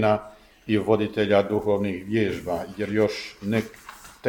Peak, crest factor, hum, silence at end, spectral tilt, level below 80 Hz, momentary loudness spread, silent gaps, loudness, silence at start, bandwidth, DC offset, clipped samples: -6 dBFS; 20 dB; none; 0 s; -6.5 dB/octave; -54 dBFS; 12 LU; none; -25 LUFS; 0 s; 18.5 kHz; under 0.1%; under 0.1%